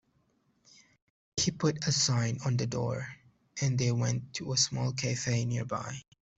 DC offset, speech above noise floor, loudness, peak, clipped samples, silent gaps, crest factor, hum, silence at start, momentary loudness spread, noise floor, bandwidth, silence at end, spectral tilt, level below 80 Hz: under 0.1%; 41 dB; -31 LUFS; -12 dBFS; under 0.1%; none; 20 dB; none; 1.35 s; 11 LU; -72 dBFS; 8.2 kHz; 0.35 s; -4 dB/octave; -62 dBFS